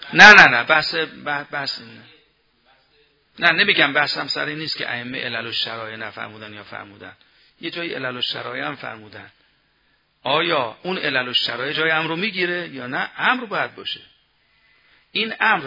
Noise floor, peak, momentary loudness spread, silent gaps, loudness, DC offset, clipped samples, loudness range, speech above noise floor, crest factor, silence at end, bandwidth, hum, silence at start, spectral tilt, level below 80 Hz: -63 dBFS; 0 dBFS; 18 LU; none; -17 LUFS; under 0.1%; 0.2%; 9 LU; 44 dB; 20 dB; 0 s; 6 kHz; none; 0 s; -3 dB/octave; -60 dBFS